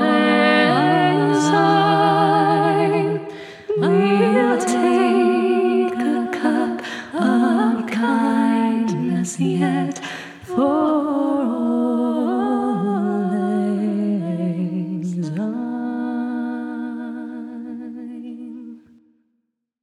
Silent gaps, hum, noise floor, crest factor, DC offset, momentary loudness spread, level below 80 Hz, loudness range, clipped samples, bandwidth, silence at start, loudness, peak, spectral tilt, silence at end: none; none; -73 dBFS; 18 dB; under 0.1%; 15 LU; -68 dBFS; 9 LU; under 0.1%; 12 kHz; 0 s; -19 LUFS; 0 dBFS; -6 dB/octave; 1.05 s